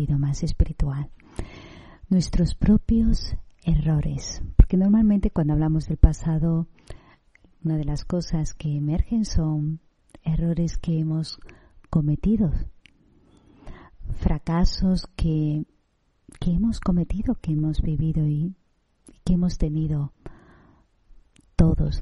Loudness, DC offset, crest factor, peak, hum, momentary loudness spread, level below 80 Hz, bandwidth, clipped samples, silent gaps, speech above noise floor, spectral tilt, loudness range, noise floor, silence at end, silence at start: -24 LUFS; under 0.1%; 20 dB; -2 dBFS; none; 13 LU; -28 dBFS; 10 kHz; under 0.1%; none; 45 dB; -7.5 dB/octave; 6 LU; -66 dBFS; 0 s; 0 s